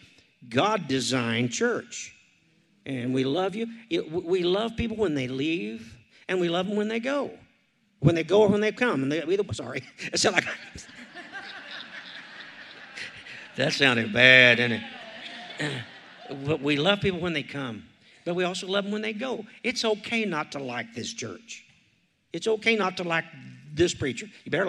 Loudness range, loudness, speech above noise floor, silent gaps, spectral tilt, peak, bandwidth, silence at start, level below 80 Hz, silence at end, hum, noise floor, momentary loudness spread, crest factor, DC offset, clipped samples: 9 LU; -25 LUFS; 41 dB; none; -4 dB/octave; -2 dBFS; 12.5 kHz; 0.4 s; -60 dBFS; 0 s; none; -67 dBFS; 19 LU; 26 dB; under 0.1%; under 0.1%